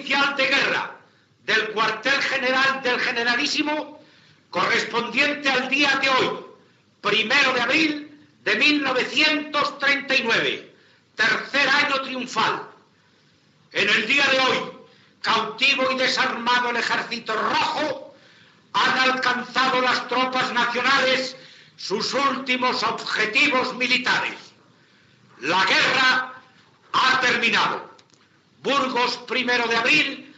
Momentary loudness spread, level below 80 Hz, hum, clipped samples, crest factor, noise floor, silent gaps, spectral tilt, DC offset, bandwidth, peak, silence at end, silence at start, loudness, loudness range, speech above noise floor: 10 LU; -76 dBFS; none; under 0.1%; 16 dB; -59 dBFS; none; -2.5 dB/octave; under 0.1%; 8.2 kHz; -6 dBFS; 0.1 s; 0 s; -20 LUFS; 2 LU; 37 dB